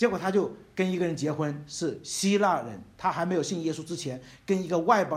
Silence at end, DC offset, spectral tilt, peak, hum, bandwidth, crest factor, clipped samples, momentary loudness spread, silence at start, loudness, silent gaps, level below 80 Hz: 0 s; under 0.1%; -5 dB/octave; -8 dBFS; none; 15 kHz; 18 dB; under 0.1%; 10 LU; 0 s; -28 LUFS; none; -64 dBFS